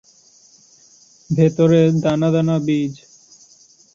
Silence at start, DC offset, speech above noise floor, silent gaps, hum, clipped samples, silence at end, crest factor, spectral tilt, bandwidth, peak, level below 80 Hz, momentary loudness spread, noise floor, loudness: 1.3 s; under 0.1%; 36 dB; none; none; under 0.1%; 1 s; 18 dB; -8 dB/octave; 7.4 kHz; -2 dBFS; -56 dBFS; 9 LU; -51 dBFS; -17 LUFS